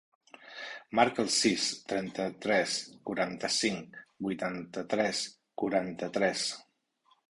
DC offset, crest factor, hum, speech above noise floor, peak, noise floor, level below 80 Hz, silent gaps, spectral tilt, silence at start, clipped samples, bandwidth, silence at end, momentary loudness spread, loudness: under 0.1%; 24 dB; none; 39 dB; -8 dBFS; -70 dBFS; -70 dBFS; none; -3 dB/octave; 0.4 s; under 0.1%; 11.5 kHz; 0.65 s; 13 LU; -31 LUFS